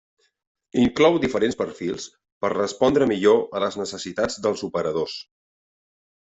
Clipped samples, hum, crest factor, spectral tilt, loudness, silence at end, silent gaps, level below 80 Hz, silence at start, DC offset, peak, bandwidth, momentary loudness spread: under 0.1%; none; 18 dB; -5 dB/octave; -22 LUFS; 1 s; 2.32-2.41 s; -56 dBFS; 0.75 s; under 0.1%; -4 dBFS; 8.2 kHz; 12 LU